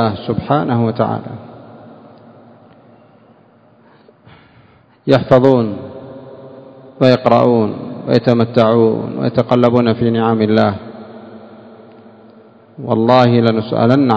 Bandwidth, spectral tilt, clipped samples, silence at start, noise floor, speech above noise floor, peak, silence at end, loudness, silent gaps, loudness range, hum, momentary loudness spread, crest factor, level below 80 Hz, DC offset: 8 kHz; -9 dB/octave; 0.3%; 0 s; -48 dBFS; 36 dB; 0 dBFS; 0 s; -13 LUFS; none; 8 LU; none; 22 LU; 16 dB; -50 dBFS; under 0.1%